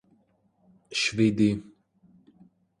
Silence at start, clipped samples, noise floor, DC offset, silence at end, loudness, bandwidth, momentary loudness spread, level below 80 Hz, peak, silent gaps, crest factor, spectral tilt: 0.9 s; under 0.1%; -67 dBFS; under 0.1%; 1.2 s; -25 LUFS; 11 kHz; 10 LU; -60 dBFS; -10 dBFS; none; 20 dB; -5 dB/octave